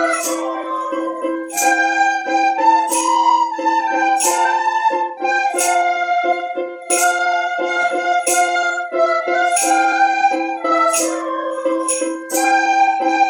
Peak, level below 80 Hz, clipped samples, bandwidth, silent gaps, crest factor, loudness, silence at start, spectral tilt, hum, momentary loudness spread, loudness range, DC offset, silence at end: -2 dBFS; -80 dBFS; under 0.1%; 17.5 kHz; none; 14 dB; -16 LUFS; 0 s; 0.5 dB/octave; none; 7 LU; 2 LU; under 0.1%; 0 s